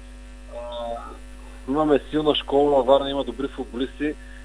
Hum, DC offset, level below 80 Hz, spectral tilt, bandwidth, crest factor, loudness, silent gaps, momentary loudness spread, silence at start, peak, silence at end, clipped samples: 50 Hz at -40 dBFS; under 0.1%; -40 dBFS; -6 dB/octave; 10.5 kHz; 20 dB; -23 LUFS; none; 21 LU; 0 s; -4 dBFS; 0 s; under 0.1%